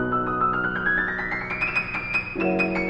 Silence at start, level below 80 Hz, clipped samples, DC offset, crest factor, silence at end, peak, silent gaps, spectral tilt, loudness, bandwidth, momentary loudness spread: 0 s; -44 dBFS; under 0.1%; under 0.1%; 16 dB; 0 s; -10 dBFS; none; -7 dB/octave; -24 LUFS; 8.4 kHz; 3 LU